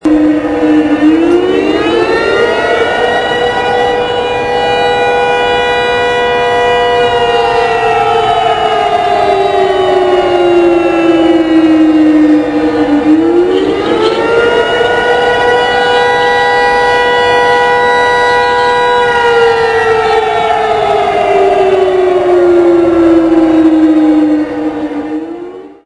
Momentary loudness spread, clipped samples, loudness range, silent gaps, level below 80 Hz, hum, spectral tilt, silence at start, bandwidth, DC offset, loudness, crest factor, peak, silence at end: 4 LU; under 0.1%; 2 LU; none; -38 dBFS; none; -5 dB/octave; 0.05 s; 10.5 kHz; under 0.1%; -9 LUFS; 8 dB; 0 dBFS; 0.1 s